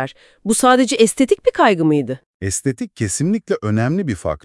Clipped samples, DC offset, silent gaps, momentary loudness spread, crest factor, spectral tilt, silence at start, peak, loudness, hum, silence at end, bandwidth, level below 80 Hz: under 0.1%; under 0.1%; 2.26-2.40 s; 10 LU; 18 dB; -5 dB/octave; 0 s; 0 dBFS; -17 LUFS; none; 0.05 s; 12 kHz; -48 dBFS